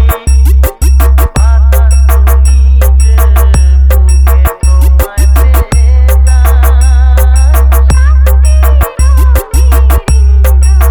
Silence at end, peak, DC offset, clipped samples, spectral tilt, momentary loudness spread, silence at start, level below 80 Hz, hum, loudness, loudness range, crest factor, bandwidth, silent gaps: 0 s; 0 dBFS; under 0.1%; 2%; -5.5 dB/octave; 2 LU; 0 s; -4 dBFS; none; -7 LUFS; 1 LU; 4 dB; 19.5 kHz; none